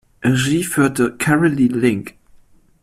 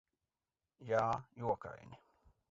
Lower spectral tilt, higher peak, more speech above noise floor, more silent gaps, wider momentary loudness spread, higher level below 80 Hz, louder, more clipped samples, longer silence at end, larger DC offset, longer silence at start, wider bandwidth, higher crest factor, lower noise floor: about the same, -5.5 dB/octave vs -5.5 dB/octave; first, -2 dBFS vs -20 dBFS; second, 33 dB vs over 51 dB; neither; second, 4 LU vs 21 LU; first, -48 dBFS vs -70 dBFS; first, -17 LUFS vs -38 LUFS; neither; first, 0.75 s vs 0.55 s; neither; second, 0.2 s vs 0.8 s; first, 15 kHz vs 7.6 kHz; second, 14 dB vs 22 dB; second, -49 dBFS vs under -90 dBFS